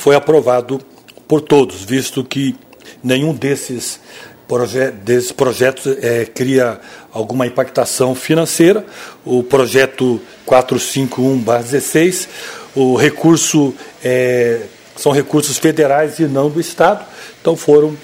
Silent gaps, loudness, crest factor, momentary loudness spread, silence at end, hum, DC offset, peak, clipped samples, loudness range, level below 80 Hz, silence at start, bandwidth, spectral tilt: none; -14 LUFS; 14 dB; 11 LU; 0.05 s; none; under 0.1%; 0 dBFS; under 0.1%; 3 LU; -54 dBFS; 0 s; 16.5 kHz; -4.5 dB/octave